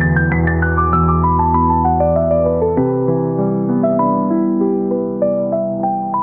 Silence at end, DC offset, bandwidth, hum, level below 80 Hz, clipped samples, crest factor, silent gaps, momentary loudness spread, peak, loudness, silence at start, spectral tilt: 0 s; 0.3%; 2.9 kHz; none; -32 dBFS; under 0.1%; 12 dB; none; 4 LU; -2 dBFS; -15 LUFS; 0 s; -10.5 dB/octave